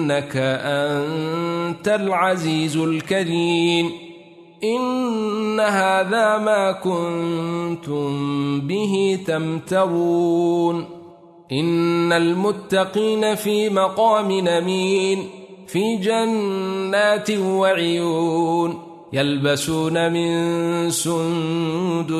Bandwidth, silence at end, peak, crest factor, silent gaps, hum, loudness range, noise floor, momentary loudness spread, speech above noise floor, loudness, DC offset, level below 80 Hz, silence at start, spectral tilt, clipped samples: 13.5 kHz; 0 s; -4 dBFS; 16 dB; none; none; 2 LU; -44 dBFS; 6 LU; 24 dB; -20 LUFS; under 0.1%; -62 dBFS; 0 s; -5 dB/octave; under 0.1%